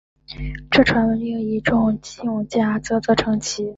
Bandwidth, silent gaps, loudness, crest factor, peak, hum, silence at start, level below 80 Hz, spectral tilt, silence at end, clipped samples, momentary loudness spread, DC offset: 8 kHz; none; -20 LUFS; 18 dB; -2 dBFS; none; 0.3 s; -40 dBFS; -5 dB/octave; 0.05 s; under 0.1%; 14 LU; under 0.1%